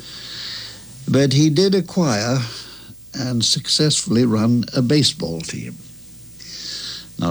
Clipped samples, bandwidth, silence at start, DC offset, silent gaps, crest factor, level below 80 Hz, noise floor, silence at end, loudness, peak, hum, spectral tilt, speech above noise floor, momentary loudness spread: under 0.1%; over 20 kHz; 0 s; under 0.1%; none; 16 dB; -52 dBFS; -40 dBFS; 0 s; -19 LUFS; -4 dBFS; none; -4.5 dB/octave; 23 dB; 18 LU